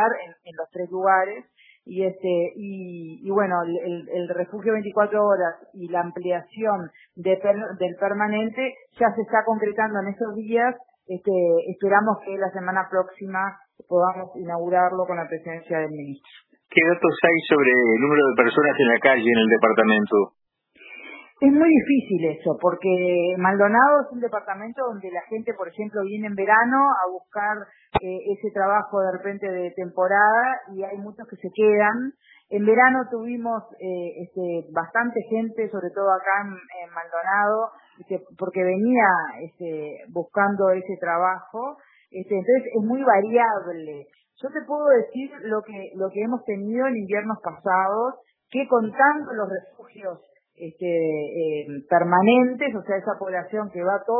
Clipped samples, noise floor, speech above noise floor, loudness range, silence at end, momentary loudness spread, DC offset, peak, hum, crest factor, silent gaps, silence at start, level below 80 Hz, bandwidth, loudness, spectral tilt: under 0.1%; -51 dBFS; 28 dB; 6 LU; 0 s; 16 LU; under 0.1%; -2 dBFS; none; 22 dB; none; 0 s; -64 dBFS; 4.1 kHz; -22 LUFS; -10 dB/octave